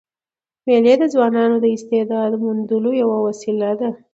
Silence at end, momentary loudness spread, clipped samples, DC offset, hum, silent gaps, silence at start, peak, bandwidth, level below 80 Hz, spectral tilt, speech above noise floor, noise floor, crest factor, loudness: 0.2 s; 8 LU; under 0.1%; under 0.1%; none; none; 0.65 s; -2 dBFS; 8 kHz; -70 dBFS; -6.5 dB/octave; over 73 dB; under -90 dBFS; 16 dB; -17 LUFS